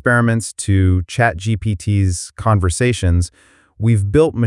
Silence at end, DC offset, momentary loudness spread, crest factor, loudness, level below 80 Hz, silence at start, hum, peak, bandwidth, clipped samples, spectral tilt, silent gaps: 0 s; under 0.1%; 6 LU; 14 dB; -17 LUFS; -36 dBFS; 0.05 s; none; 0 dBFS; 12 kHz; under 0.1%; -6 dB/octave; none